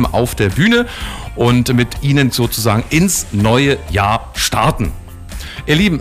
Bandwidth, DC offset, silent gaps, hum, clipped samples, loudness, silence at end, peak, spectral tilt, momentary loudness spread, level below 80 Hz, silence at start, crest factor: 16 kHz; under 0.1%; none; none; under 0.1%; -14 LUFS; 0 s; -4 dBFS; -5 dB/octave; 13 LU; -28 dBFS; 0 s; 10 dB